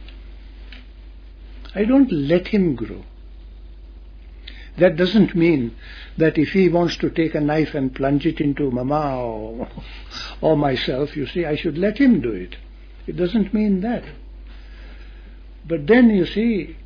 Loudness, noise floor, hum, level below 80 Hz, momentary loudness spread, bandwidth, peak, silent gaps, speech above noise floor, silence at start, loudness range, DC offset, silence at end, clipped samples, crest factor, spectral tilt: -19 LUFS; -39 dBFS; none; -38 dBFS; 23 LU; 5.4 kHz; -2 dBFS; none; 20 dB; 0 s; 4 LU; under 0.1%; 0 s; under 0.1%; 18 dB; -8 dB/octave